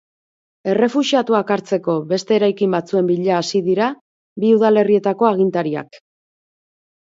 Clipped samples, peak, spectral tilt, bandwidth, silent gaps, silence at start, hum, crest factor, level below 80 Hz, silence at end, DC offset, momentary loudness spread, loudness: under 0.1%; -2 dBFS; -6 dB/octave; 7.8 kHz; 4.01-4.36 s; 0.65 s; none; 16 dB; -66 dBFS; 1.05 s; under 0.1%; 8 LU; -17 LUFS